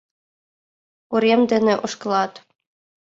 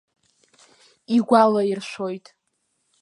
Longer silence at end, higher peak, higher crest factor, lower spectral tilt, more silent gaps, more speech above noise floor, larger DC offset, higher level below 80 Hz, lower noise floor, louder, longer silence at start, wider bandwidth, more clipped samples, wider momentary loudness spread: about the same, 0.75 s vs 0.85 s; about the same, -6 dBFS vs -4 dBFS; about the same, 18 dB vs 20 dB; about the same, -5 dB/octave vs -6 dB/octave; neither; first, over 71 dB vs 53 dB; neither; first, -66 dBFS vs -78 dBFS; first, under -90 dBFS vs -73 dBFS; about the same, -20 LUFS vs -20 LUFS; about the same, 1.1 s vs 1.1 s; second, 7.8 kHz vs 11 kHz; neither; second, 8 LU vs 14 LU